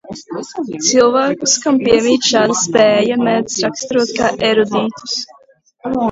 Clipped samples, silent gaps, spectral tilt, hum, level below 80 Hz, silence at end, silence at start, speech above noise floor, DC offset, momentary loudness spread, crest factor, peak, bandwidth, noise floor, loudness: under 0.1%; none; -3 dB/octave; none; -50 dBFS; 0 s; 0.05 s; 32 dB; under 0.1%; 13 LU; 14 dB; 0 dBFS; 8 kHz; -46 dBFS; -14 LUFS